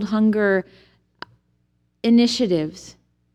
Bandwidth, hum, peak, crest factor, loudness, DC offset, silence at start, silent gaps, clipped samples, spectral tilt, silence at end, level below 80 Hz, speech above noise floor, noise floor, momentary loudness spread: 9.6 kHz; 60 Hz at -55 dBFS; -6 dBFS; 16 dB; -20 LUFS; under 0.1%; 0 s; none; under 0.1%; -5.5 dB/octave; 0.45 s; -60 dBFS; 48 dB; -67 dBFS; 25 LU